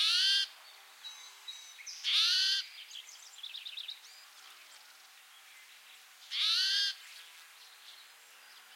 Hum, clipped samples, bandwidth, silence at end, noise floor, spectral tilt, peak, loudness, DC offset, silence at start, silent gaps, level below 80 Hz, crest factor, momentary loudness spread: none; under 0.1%; 16.5 kHz; 0 s; -57 dBFS; 8 dB/octave; -18 dBFS; -30 LUFS; under 0.1%; 0 s; none; under -90 dBFS; 20 dB; 27 LU